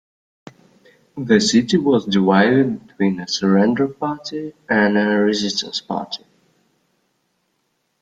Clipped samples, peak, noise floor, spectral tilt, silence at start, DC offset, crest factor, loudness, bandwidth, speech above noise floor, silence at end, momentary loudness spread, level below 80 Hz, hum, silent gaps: under 0.1%; -2 dBFS; -69 dBFS; -5 dB/octave; 1.15 s; under 0.1%; 18 dB; -18 LUFS; 9.2 kHz; 52 dB; 1.85 s; 14 LU; -58 dBFS; none; none